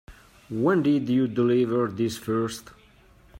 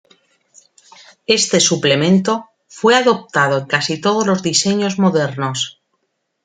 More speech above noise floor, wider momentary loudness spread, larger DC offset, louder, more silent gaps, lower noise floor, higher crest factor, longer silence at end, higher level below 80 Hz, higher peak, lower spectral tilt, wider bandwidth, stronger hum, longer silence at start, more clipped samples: second, 31 dB vs 55 dB; about the same, 9 LU vs 8 LU; neither; second, -24 LUFS vs -15 LUFS; neither; second, -55 dBFS vs -70 dBFS; about the same, 16 dB vs 16 dB; second, 0 s vs 0.75 s; about the same, -58 dBFS vs -60 dBFS; second, -10 dBFS vs 0 dBFS; first, -6.5 dB/octave vs -3.5 dB/octave; first, 16 kHz vs 9.6 kHz; neither; second, 0.1 s vs 1.3 s; neither